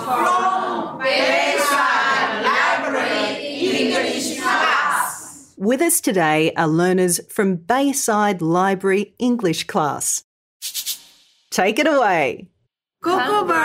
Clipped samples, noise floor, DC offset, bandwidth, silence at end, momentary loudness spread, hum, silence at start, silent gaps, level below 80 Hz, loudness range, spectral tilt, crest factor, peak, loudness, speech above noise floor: under 0.1%; -71 dBFS; under 0.1%; 16 kHz; 0 s; 8 LU; none; 0 s; 10.24-10.60 s; -66 dBFS; 3 LU; -3.5 dB/octave; 16 dB; -2 dBFS; -18 LUFS; 53 dB